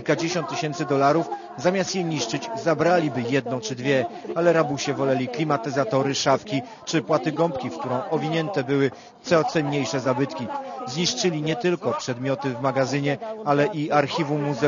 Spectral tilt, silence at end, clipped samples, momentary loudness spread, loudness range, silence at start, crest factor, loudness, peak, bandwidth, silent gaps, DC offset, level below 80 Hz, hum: -5 dB/octave; 0 s; under 0.1%; 7 LU; 2 LU; 0 s; 20 dB; -24 LUFS; -4 dBFS; 7.4 kHz; none; under 0.1%; -64 dBFS; none